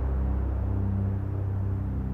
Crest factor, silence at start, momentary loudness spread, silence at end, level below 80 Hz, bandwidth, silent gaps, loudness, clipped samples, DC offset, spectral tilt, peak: 10 dB; 0 s; 2 LU; 0 s; -32 dBFS; 2.9 kHz; none; -29 LUFS; under 0.1%; under 0.1%; -11.5 dB/octave; -18 dBFS